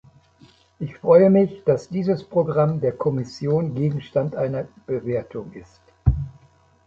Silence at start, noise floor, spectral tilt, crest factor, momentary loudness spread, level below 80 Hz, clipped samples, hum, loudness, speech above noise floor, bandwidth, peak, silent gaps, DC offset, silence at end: 0.8 s; -55 dBFS; -9.5 dB/octave; 18 dB; 16 LU; -38 dBFS; under 0.1%; none; -21 LUFS; 34 dB; 7.6 kHz; -2 dBFS; none; under 0.1%; 0.55 s